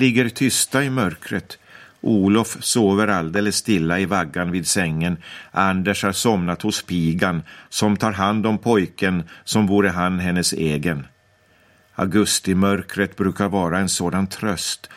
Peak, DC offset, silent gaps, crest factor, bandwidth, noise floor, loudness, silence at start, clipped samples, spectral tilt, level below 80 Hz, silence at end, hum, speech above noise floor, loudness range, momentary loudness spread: -2 dBFS; under 0.1%; none; 18 dB; 16 kHz; -57 dBFS; -20 LUFS; 0 s; under 0.1%; -4.5 dB/octave; -50 dBFS; 0 s; none; 37 dB; 2 LU; 8 LU